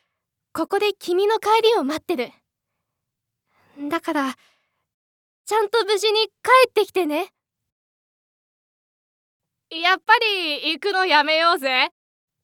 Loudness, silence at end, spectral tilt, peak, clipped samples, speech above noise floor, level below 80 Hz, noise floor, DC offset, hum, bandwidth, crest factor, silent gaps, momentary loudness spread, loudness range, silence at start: -20 LUFS; 0.55 s; -1.5 dB/octave; 0 dBFS; under 0.1%; 62 dB; -76 dBFS; -82 dBFS; under 0.1%; none; 18.5 kHz; 22 dB; 4.94-5.44 s, 7.72-9.40 s; 12 LU; 10 LU; 0.55 s